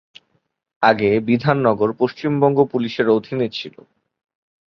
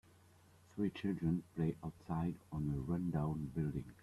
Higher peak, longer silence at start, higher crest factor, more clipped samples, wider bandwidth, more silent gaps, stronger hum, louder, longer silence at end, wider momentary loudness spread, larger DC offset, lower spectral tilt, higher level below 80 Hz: first, -2 dBFS vs -26 dBFS; about the same, 0.8 s vs 0.75 s; about the same, 18 dB vs 16 dB; neither; second, 6.4 kHz vs 12.5 kHz; neither; neither; first, -18 LUFS vs -40 LUFS; first, 1 s vs 0.1 s; about the same, 7 LU vs 5 LU; neither; about the same, -8 dB/octave vs -9 dB/octave; about the same, -58 dBFS vs -60 dBFS